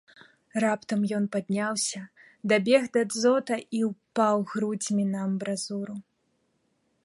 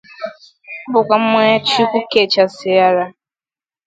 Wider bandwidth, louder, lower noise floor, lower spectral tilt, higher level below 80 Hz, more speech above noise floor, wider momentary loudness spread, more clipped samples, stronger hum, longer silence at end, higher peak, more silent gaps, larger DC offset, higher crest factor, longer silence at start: first, 11.5 kHz vs 9.2 kHz; second, -27 LUFS vs -14 LUFS; second, -73 dBFS vs under -90 dBFS; about the same, -4.5 dB/octave vs -4.5 dB/octave; second, -74 dBFS vs -60 dBFS; second, 46 dB vs over 76 dB; second, 11 LU vs 17 LU; neither; neither; first, 1.05 s vs 0.75 s; second, -8 dBFS vs 0 dBFS; neither; neither; about the same, 20 dB vs 16 dB; first, 0.55 s vs 0.2 s